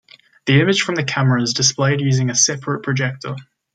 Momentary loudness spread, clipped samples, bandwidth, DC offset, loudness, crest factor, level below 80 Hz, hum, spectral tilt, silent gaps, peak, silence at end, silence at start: 12 LU; under 0.1%; 9.2 kHz; under 0.1%; -17 LUFS; 16 dB; -58 dBFS; none; -4 dB/octave; none; -2 dBFS; 0.35 s; 0.45 s